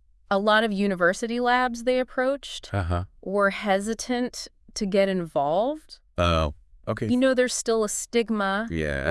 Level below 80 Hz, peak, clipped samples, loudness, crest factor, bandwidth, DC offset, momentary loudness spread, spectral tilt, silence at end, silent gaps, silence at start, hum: -46 dBFS; -6 dBFS; under 0.1%; -25 LUFS; 18 dB; 12 kHz; under 0.1%; 10 LU; -4.5 dB/octave; 0 s; none; 0.3 s; none